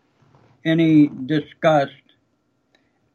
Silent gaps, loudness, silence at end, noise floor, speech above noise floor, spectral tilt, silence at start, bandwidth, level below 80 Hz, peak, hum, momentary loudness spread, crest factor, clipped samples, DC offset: none; -19 LUFS; 1.25 s; -67 dBFS; 50 dB; -8 dB/octave; 0.65 s; 7 kHz; -66 dBFS; -4 dBFS; none; 11 LU; 16 dB; under 0.1%; under 0.1%